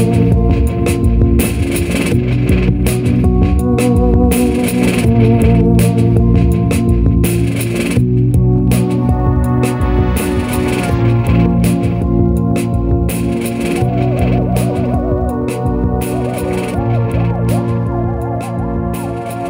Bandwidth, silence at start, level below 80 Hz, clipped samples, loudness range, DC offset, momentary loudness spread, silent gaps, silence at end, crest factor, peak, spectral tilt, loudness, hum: 16.5 kHz; 0 s; -20 dBFS; under 0.1%; 4 LU; under 0.1%; 6 LU; none; 0 s; 12 dB; 0 dBFS; -7.5 dB/octave; -14 LUFS; none